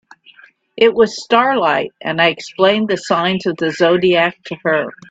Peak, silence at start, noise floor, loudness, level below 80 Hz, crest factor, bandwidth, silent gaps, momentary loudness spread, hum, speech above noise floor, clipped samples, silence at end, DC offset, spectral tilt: 0 dBFS; 0.75 s; -46 dBFS; -15 LUFS; -58 dBFS; 16 dB; 8 kHz; none; 6 LU; none; 31 dB; under 0.1%; 0.2 s; under 0.1%; -5 dB/octave